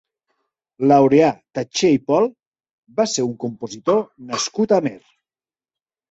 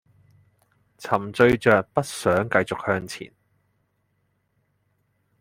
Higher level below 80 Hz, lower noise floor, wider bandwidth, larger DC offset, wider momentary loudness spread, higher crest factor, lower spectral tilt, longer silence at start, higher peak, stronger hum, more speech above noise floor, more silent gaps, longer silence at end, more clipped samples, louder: second, -62 dBFS vs -56 dBFS; first, under -90 dBFS vs -71 dBFS; second, 8.2 kHz vs 16 kHz; neither; second, 14 LU vs 18 LU; about the same, 18 dB vs 22 dB; about the same, -5 dB/octave vs -5.5 dB/octave; second, 0.8 s vs 1 s; about the same, -2 dBFS vs -2 dBFS; neither; first, over 72 dB vs 49 dB; first, 2.47-2.52 s, 2.73-2.83 s vs none; second, 1.15 s vs 2.15 s; neither; first, -19 LUFS vs -22 LUFS